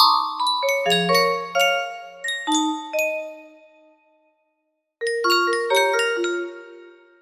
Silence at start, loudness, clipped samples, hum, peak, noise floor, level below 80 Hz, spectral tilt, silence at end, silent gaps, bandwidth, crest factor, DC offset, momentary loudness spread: 0 s; -21 LUFS; under 0.1%; none; -2 dBFS; -74 dBFS; -74 dBFS; -2.5 dB/octave; 0.3 s; none; 15.5 kHz; 20 dB; under 0.1%; 12 LU